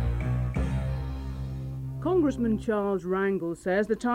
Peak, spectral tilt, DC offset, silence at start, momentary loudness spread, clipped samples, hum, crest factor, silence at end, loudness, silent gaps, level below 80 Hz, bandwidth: -14 dBFS; -8 dB/octave; under 0.1%; 0 s; 10 LU; under 0.1%; none; 14 dB; 0 s; -29 LUFS; none; -36 dBFS; 11 kHz